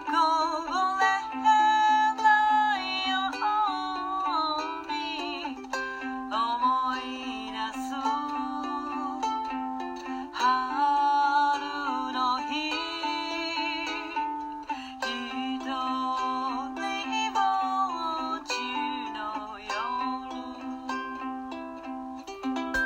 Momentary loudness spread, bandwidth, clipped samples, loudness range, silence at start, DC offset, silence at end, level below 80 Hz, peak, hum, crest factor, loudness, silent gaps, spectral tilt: 12 LU; 16 kHz; under 0.1%; 8 LU; 0 s; under 0.1%; 0 s; -62 dBFS; -10 dBFS; none; 18 dB; -28 LUFS; none; -2 dB/octave